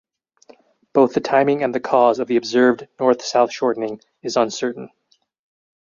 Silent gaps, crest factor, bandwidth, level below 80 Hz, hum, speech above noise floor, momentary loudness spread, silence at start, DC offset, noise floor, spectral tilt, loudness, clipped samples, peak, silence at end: none; 18 dB; 7.4 kHz; -68 dBFS; none; 33 dB; 10 LU; 0.95 s; under 0.1%; -51 dBFS; -4.5 dB/octave; -19 LUFS; under 0.1%; -2 dBFS; 1.05 s